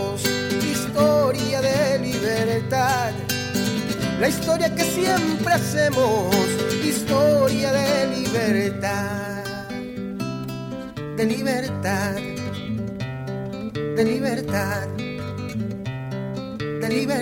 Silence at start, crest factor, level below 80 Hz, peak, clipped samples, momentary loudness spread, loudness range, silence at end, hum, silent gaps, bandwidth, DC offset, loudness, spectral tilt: 0 s; 18 dB; -50 dBFS; -4 dBFS; under 0.1%; 11 LU; 6 LU; 0 s; none; none; 17 kHz; under 0.1%; -23 LUFS; -5 dB/octave